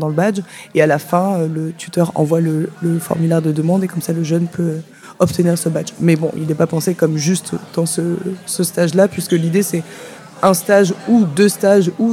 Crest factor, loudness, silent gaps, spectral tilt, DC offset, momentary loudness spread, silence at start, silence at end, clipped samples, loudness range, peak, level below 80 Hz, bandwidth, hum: 16 dB; -16 LUFS; none; -6 dB/octave; under 0.1%; 8 LU; 0 s; 0 s; under 0.1%; 3 LU; 0 dBFS; -58 dBFS; 16 kHz; none